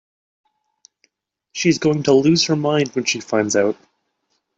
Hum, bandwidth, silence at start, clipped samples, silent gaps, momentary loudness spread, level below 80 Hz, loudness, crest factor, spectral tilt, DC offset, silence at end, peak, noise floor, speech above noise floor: none; 8.2 kHz; 1.55 s; under 0.1%; none; 7 LU; -62 dBFS; -18 LUFS; 18 dB; -4.5 dB/octave; under 0.1%; 0.85 s; -4 dBFS; -71 dBFS; 54 dB